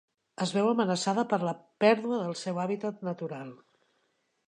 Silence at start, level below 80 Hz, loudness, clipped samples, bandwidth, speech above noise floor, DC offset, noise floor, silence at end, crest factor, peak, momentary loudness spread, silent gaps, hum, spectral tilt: 0.4 s; -80 dBFS; -29 LUFS; under 0.1%; 10.5 kHz; 46 dB; under 0.1%; -75 dBFS; 0.95 s; 20 dB; -10 dBFS; 12 LU; none; none; -5.5 dB/octave